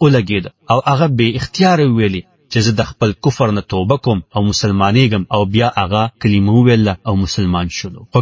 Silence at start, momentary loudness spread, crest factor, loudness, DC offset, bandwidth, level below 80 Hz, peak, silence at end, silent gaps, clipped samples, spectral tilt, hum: 0 s; 7 LU; 14 dB; -14 LUFS; under 0.1%; 7.6 kHz; -34 dBFS; 0 dBFS; 0 s; none; under 0.1%; -6 dB/octave; none